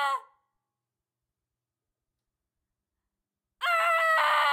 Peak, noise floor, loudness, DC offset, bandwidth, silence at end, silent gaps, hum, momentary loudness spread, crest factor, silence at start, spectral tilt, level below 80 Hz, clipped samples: -12 dBFS; -89 dBFS; -24 LUFS; under 0.1%; 16.5 kHz; 0 s; none; none; 10 LU; 18 dB; 0 s; 2.5 dB/octave; under -90 dBFS; under 0.1%